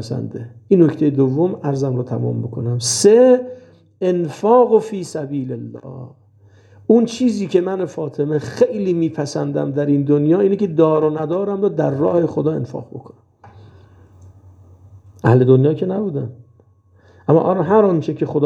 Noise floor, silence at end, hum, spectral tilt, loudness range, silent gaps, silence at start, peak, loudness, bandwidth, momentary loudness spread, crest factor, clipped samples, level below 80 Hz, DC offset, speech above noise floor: -52 dBFS; 0 s; none; -6.5 dB/octave; 5 LU; none; 0 s; 0 dBFS; -17 LUFS; 12.5 kHz; 15 LU; 16 dB; under 0.1%; -62 dBFS; under 0.1%; 36 dB